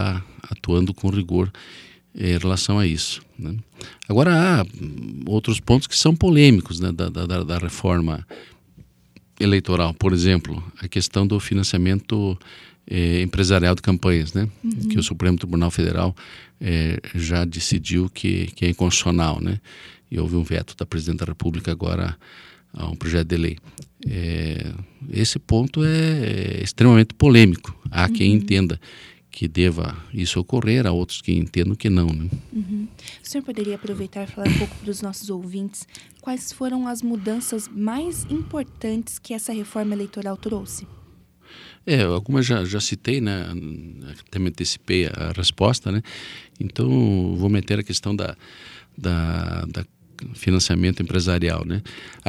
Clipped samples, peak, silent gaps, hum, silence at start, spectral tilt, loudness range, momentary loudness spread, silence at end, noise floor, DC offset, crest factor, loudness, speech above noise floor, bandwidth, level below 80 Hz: under 0.1%; 0 dBFS; none; none; 0 s; -5.5 dB/octave; 9 LU; 15 LU; 0 s; -53 dBFS; under 0.1%; 22 dB; -21 LUFS; 32 dB; 13.5 kHz; -38 dBFS